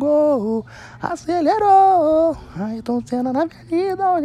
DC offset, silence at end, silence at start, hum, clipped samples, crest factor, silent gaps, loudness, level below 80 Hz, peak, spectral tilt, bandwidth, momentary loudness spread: under 0.1%; 0 s; 0 s; none; under 0.1%; 12 dB; none; -18 LUFS; -50 dBFS; -6 dBFS; -7 dB/octave; 11 kHz; 15 LU